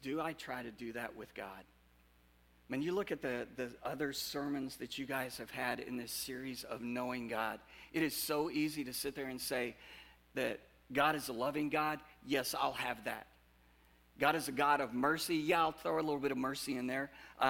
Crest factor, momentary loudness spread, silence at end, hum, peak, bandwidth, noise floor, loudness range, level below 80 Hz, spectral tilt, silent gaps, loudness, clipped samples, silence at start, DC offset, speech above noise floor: 24 dB; 12 LU; 0 s; none; -16 dBFS; 17 kHz; -68 dBFS; 7 LU; -68 dBFS; -3.5 dB/octave; none; -38 LUFS; under 0.1%; 0 s; under 0.1%; 30 dB